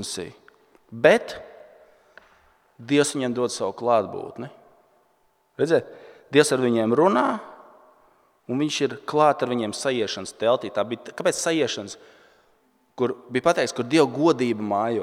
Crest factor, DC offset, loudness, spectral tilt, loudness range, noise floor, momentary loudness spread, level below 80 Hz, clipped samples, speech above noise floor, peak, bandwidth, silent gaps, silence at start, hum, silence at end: 22 dB; under 0.1%; -23 LUFS; -4.5 dB/octave; 3 LU; -65 dBFS; 16 LU; -68 dBFS; under 0.1%; 42 dB; -2 dBFS; 15.5 kHz; none; 0 s; none; 0 s